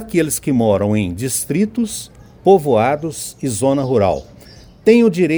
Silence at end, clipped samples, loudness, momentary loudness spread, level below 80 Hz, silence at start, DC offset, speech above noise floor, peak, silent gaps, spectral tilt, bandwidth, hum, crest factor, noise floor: 0 s; under 0.1%; -16 LUFS; 11 LU; -46 dBFS; 0 s; under 0.1%; 26 dB; 0 dBFS; none; -5.5 dB/octave; over 20 kHz; none; 16 dB; -41 dBFS